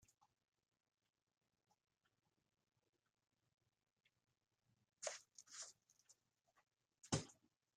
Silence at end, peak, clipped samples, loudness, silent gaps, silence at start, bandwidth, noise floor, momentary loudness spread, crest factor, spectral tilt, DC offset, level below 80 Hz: 0.45 s; -26 dBFS; under 0.1%; -51 LUFS; none; 5 s; 13.5 kHz; -84 dBFS; 14 LU; 32 dB; -3.5 dB/octave; under 0.1%; -84 dBFS